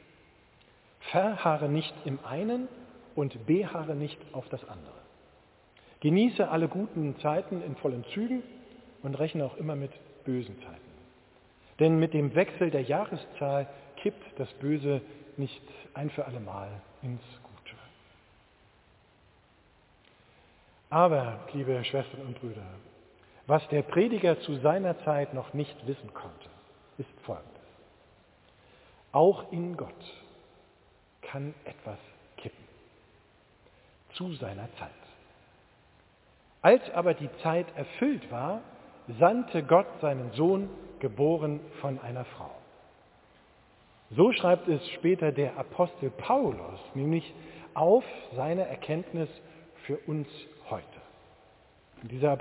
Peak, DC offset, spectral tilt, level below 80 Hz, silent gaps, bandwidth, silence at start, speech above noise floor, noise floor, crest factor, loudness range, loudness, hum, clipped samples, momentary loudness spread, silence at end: -6 dBFS; under 0.1%; -6 dB/octave; -66 dBFS; none; 4 kHz; 1 s; 34 dB; -63 dBFS; 24 dB; 16 LU; -30 LUFS; none; under 0.1%; 21 LU; 0 s